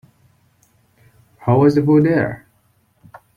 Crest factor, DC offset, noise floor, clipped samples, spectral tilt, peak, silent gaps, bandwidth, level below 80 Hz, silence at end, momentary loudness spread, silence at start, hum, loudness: 16 dB; under 0.1%; -60 dBFS; under 0.1%; -9.5 dB/octave; -2 dBFS; none; 7 kHz; -54 dBFS; 1 s; 13 LU; 1.4 s; none; -16 LUFS